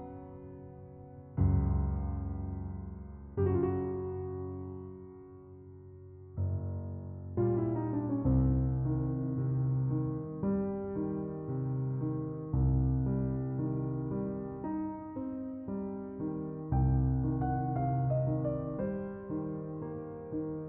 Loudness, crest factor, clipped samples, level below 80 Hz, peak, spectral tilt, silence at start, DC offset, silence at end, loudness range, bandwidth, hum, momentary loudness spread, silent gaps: -34 LUFS; 16 dB; under 0.1%; -42 dBFS; -16 dBFS; -10 dB/octave; 0 s; under 0.1%; 0 s; 5 LU; 2.5 kHz; none; 17 LU; none